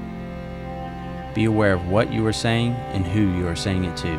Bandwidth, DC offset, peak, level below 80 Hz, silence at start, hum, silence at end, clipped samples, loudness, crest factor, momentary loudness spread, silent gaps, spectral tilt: 13 kHz; under 0.1%; -6 dBFS; -40 dBFS; 0 s; none; 0 s; under 0.1%; -23 LUFS; 16 dB; 13 LU; none; -6 dB/octave